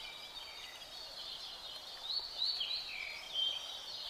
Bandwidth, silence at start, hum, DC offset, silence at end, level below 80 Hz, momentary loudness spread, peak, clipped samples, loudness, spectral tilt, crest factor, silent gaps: 15.5 kHz; 0 s; none; under 0.1%; 0 s; -70 dBFS; 11 LU; -26 dBFS; under 0.1%; -39 LUFS; 0.5 dB/octave; 18 dB; none